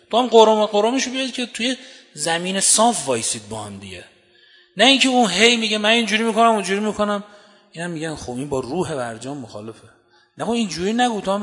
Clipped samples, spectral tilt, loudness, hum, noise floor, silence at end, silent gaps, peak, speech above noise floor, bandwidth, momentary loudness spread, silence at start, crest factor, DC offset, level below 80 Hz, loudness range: under 0.1%; -2.5 dB/octave; -18 LUFS; none; -53 dBFS; 0 s; none; 0 dBFS; 34 dB; 11 kHz; 18 LU; 0.1 s; 20 dB; under 0.1%; -58 dBFS; 10 LU